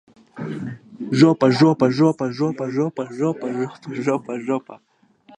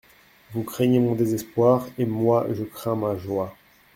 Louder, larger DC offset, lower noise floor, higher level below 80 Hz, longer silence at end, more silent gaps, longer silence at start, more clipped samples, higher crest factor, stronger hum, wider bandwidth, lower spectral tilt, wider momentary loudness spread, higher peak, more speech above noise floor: first, -20 LUFS vs -23 LUFS; neither; about the same, -52 dBFS vs -51 dBFS; second, -66 dBFS vs -60 dBFS; first, 0.65 s vs 0.45 s; neither; second, 0.35 s vs 0.5 s; neither; about the same, 20 dB vs 18 dB; neither; second, 9.8 kHz vs 16.5 kHz; about the same, -7 dB/octave vs -7.5 dB/octave; first, 15 LU vs 11 LU; first, -2 dBFS vs -6 dBFS; about the same, 32 dB vs 29 dB